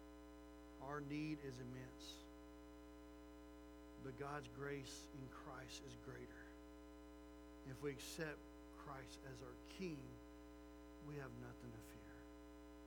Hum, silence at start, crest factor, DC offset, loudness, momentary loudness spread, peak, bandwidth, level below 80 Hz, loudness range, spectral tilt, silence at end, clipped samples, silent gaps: 60 Hz at -65 dBFS; 0 s; 20 dB; under 0.1%; -55 LUFS; 12 LU; -34 dBFS; over 20 kHz; -66 dBFS; 3 LU; -5 dB/octave; 0 s; under 0.1%; none